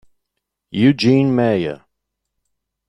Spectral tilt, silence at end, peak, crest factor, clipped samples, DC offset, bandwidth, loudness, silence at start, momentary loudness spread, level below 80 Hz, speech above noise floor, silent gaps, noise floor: -7.5 dB/octave; 1.15 s; -2 dBFS; 16 dB; under 0.1%; under 0.1%; 10 kHz; -16 LUFS; 0.75 s; 14 LU; -56 dBFS; 63 dB; none; -78 dBFS